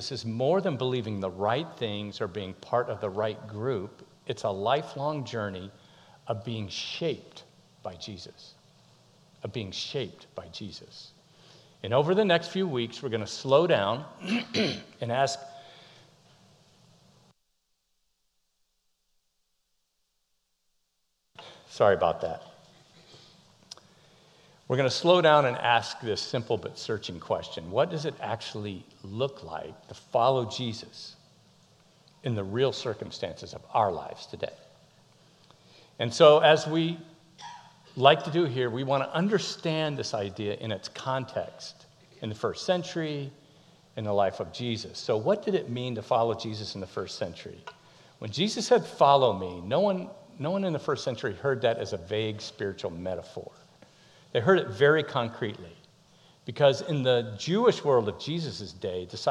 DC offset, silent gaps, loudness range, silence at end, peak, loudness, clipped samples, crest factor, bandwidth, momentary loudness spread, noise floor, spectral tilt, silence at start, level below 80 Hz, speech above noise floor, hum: under 0.1%; none; 9 LU; 0 s; -4 dBFS; -28 LUFS; under 0.1%; 24 dB; 11.5 kHz; 20 LU; -77 dBFS; -5.5 dB/octave; 0 s; -68 dBFS; 49 dB; none